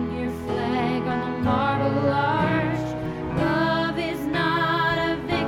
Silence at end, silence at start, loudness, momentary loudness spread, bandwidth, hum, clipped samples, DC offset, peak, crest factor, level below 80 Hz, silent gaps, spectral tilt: 0 s; 0 s; -24 LUFS; 6 LU; 16.5 kHz; none; under 0.1%; under 0.1%; -8 dBFS; 14 dB; -44 dBFS; none; -7 dB/octave